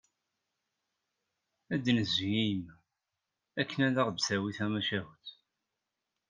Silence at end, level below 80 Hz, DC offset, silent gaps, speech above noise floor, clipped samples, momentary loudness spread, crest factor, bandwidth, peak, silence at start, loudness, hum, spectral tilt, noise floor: 1 s; -72 dBFS; under 0.1%; none; 56 dB; under 0.1%; 17 LU; 22 dB; 9.8 kHz; -14 dBFS; 1.7 s; -32 LUFS; none; -4.5 dB/octave; -87 dBFS